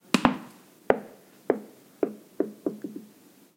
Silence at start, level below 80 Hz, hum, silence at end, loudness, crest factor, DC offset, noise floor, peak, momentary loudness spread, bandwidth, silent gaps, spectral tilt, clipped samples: 0.15 s; -58 dBFS; none; 0.5 s; -30 LUFS; 30 dB; under 0.1%; -56 dBFS; 0 dBFS; 23 LU; 16.5 kHz; none; -5 dB/octave; under 0.1%